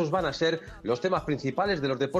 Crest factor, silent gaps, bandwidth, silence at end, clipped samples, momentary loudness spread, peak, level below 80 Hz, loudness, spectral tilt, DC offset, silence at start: 14 dB; none; 12 kHz; 0 s; under 0.1%; 4 LU; -12 dBFS; -52 dBFS; -28 LUFS; -6 dB/octave; under 0.1%; 0 s